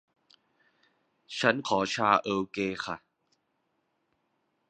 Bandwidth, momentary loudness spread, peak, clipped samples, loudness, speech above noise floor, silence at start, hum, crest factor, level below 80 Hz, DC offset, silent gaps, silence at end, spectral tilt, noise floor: 10 kHz; 13 LU; -6 dBFS; under 0.1%; -28 LUFS; 49 dB; 1.3 s; none; 26 dB; -68 dBFS; under 0.1%; none; 1.75 s; -4 dB/octave; -77 dBFS